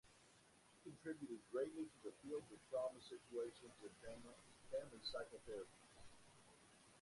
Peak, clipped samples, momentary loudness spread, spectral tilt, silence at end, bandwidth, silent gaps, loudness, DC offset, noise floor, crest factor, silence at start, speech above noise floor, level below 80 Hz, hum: -34 dBFS; under 0.1%; 20 LU; -4.5 dB/octave; 0 s; 11.5 kHz; none; -52 LUFS; under 0.1%; -72 dBFS; 18 dB; 0.05 s; 20 dB; -80 dBFS; none